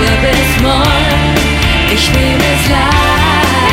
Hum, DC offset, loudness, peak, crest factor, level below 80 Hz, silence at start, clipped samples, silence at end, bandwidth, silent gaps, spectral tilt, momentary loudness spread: none; under 0.1%; -10 LUFS; 0 dBFS; 10 dB; -16 dBFS; 0 s; under 0.1%; 0 s; 16.5 kHz; none; -4.5 dB/octave; 1 LU